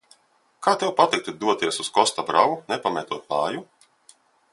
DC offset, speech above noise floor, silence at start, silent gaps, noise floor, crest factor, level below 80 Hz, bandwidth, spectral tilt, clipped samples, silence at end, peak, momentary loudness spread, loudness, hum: under 0.1%; 39 dB; 0.6 s; none; -62 dBFS; 22 dB; -70 dBFS; 11.5 kHz; -3 dB/octave; under 0.1%; 0.9 s; -2 dBFS; 7 LU; -23 LUFS; none